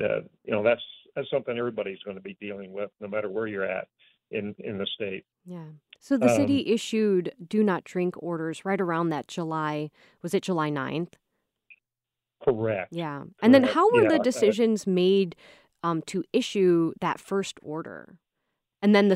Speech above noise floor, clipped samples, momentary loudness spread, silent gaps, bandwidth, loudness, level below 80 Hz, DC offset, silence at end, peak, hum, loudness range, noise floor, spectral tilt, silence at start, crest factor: 63 dB; under 0.1%; 16 LU; none; 14.5 kHz; -26 LUFS; -70 dBFS; under 0.1%; 0 s; -4 dBFS; none; 10 LU; -89 dBFS; -6 dB/octave; 0 s; 22 dB